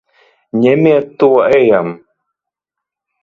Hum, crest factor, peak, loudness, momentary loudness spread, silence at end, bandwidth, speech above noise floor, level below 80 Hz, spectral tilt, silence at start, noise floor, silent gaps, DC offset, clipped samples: none; 14 dB; 0 dBFS; -11 LUFS; 8 LU; 1.25 s; 7 kHz; 71 dB; -56 dBFS; -8.5 dB/octave; 0.55 s; -82 dBFS; none; under 0.1%; under 0.1%